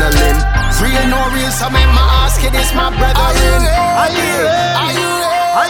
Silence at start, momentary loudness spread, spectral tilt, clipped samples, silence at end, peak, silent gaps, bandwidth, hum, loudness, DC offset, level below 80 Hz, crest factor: 0 s; 3 LU; -4 dB/octave; under 0.1%; 0 s; 0 dBFS; none; 19 kHz; none; -12 LUFS; under 0.1%; -14 dBFS; 10 dB